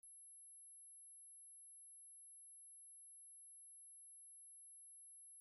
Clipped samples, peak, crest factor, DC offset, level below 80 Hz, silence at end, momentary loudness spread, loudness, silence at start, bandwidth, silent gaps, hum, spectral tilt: under 0.1%; -56 dBFS; 4 dB; under 0.1%; under -90 dBFS; 0 s; 0 LU; -58 LUFS; 0.05 s; 16 kHz; none; none; 4 dB/octave